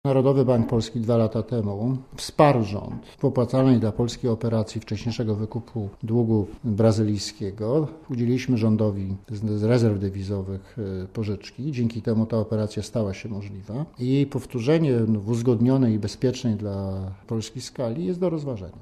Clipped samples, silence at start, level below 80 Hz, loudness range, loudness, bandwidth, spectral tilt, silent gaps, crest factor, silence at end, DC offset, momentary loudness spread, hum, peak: under 0.1%; 0.05 s; -48 dBFS; 4 LU; -24 LUFS; 12.5 kHz; -7.5 dB/octave; none; 20 dB; 0 s; under 0.1%; 11 LU; none; -4 dBFS